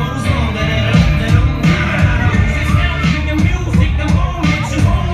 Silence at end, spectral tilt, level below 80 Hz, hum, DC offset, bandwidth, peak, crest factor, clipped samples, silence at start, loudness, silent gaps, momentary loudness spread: 0 s; -6.5 dB/octave; -18 dBFS; none; under 0.1%; 13.5 kHz; 0 dBFS; 12 dB; under 0.1%; 0 s; -14 LUFS; none; 3 LU